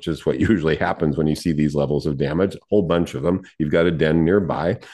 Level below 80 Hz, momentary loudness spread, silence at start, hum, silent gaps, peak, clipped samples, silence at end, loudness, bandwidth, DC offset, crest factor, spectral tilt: -44 dBFS; 5 LU; 0 s; none; none; -4 dBFS; under 0.1%; 0 s; -20 LUFS; 12.5 kHz; under 0.1%; 16 dB; -7.5 dB/octave